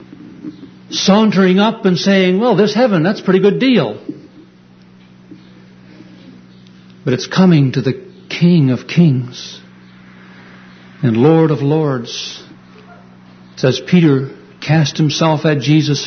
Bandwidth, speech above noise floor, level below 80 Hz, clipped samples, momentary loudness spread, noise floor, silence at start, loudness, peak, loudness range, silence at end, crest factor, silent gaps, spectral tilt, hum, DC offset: 6.6 kHz; 31 dB; -56 dBFS; under 0.1%; 17 LU; -43 dBFS; 0 s; -13 LUFS; 0 dBFS; 6 LU; 0 s; 14 dB; none; -6.5 dB/octave; none; under 0.1%